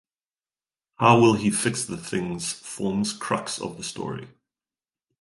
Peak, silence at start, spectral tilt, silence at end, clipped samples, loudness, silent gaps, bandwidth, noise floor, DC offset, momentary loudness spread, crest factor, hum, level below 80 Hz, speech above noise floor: -4 dBFS; 1 s; -4.5 dB/octave; 0.95 s; under 0.1%; -24 LUFS; none; 12 kHz; under -90 dBFS; under 0.1%; 15 LU; 22 dB; none; -58 dBFS; over 66 dB